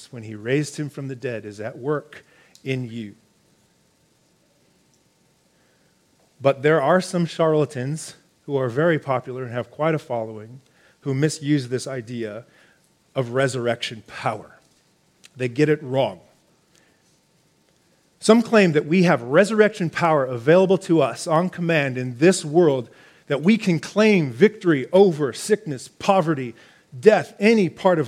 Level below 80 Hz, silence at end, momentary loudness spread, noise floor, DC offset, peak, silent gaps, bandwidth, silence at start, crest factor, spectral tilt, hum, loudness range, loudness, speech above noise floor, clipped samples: -70 dBFS; 0 s; 14 LU; -62 dBFS; under 0.1%; 0 dBFS; none; 14.5 kHz; 0 s; 22 dB; -6 dB/octave; none; 11 LU; -21 LUFS; 41 dB; under 0.1%